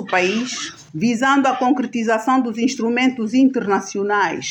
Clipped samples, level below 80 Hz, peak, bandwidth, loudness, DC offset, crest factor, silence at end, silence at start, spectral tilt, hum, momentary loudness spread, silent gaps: under 0.1%; -66 dBFS; -4 dBFS; 8.8 kHz; -18 LUFS; under 0.1%; 16 dB; 0 s; 0 s; -4 dB/octave; none; 6 LU; none